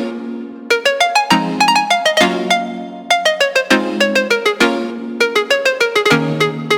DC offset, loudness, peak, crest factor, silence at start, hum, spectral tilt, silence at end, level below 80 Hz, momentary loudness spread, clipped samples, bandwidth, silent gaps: under 0.1%; -14 LUFS; 0 dBFS; 14 dB; 0 s; none; -3.5 dB/octave; 0 s; -56 dBFS; 11 LU; under 0.1%; 19 kHz; none